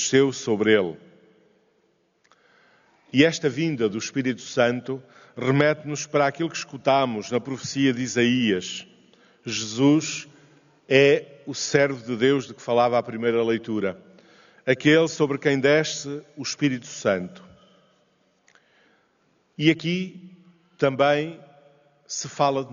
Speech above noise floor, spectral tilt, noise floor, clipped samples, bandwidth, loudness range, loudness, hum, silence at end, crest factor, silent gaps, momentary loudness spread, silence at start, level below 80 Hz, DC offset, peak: 44 dB; -4 dB/octave; -66 dBFS; under 0.1%; 7.4 kHz; 6 LU; -23 LUFS; none; 0 s; 20 dB; none; 12 LU; 0 s; -68 dBFS; under 0.1%; -4 dBFS